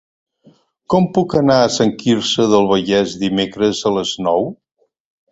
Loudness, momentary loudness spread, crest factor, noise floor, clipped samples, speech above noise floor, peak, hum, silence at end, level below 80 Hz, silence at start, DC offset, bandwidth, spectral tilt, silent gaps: -16 LUFS; 5 LU; 16 dB; -52 dBFS; under 0.1%; 37 dB; 0 dBFS; none; 0.8 s; -50 dBFS; 0.9 s; under 0.1%; 8.2 kHz; -5 dB/octave; none